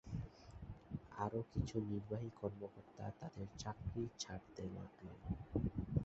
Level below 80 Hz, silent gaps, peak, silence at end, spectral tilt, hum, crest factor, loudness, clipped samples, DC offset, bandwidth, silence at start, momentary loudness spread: -56 dBFS; none; -24 dBFS; 0 s; -7.5 dB/octave; none; 22 dB; -47 LUFS; under 0.1%; under 0.1%; 8 kHz; 0.05 s; 12 LU